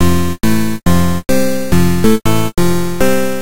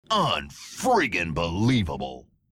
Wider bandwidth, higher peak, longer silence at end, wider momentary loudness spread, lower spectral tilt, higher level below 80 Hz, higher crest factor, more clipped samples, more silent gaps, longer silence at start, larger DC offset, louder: about the same, 17 kHz vs 17 kHz; first, 0 dBFS vs -10 dBFS; second, 0 s vs 0.35 s; second, 3 LU vs 12 LU; about the same, -5.5 dB/octave vs -5 dB/octave; first, -28 dBFS vs -46 dBFS; about the same, 12 dB vs 16 dB; neither; neither; about the same, 0 s vs 0.1 s; first, 20% vs under 0.1%; first, -14 LUFS vs -25 LUFS